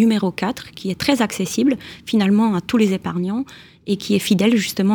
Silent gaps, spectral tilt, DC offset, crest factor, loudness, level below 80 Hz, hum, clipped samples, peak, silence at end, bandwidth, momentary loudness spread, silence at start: none; -5.5 dB/octave; under 0.1%; 16 dB; -19 LUFS; -54 dBFS; none; under 0.1%; -2 dBFS; 0 s; over 20 kHz; 11 LU; 0 s